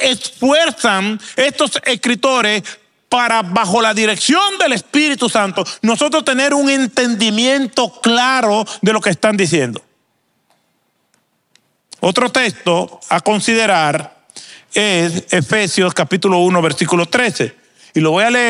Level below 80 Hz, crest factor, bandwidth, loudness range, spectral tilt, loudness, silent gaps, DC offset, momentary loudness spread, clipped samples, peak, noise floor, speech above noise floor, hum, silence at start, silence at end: -64 dBFS; 14 dB; 14.5 kHz; 5 LU; -3.5 dB/octave; -14 LUFS; none; under 0.1%; 6 LU; under 0.1%; 0 dBFS; -64 dBFS; 49 dB; none; 0 s; 0 s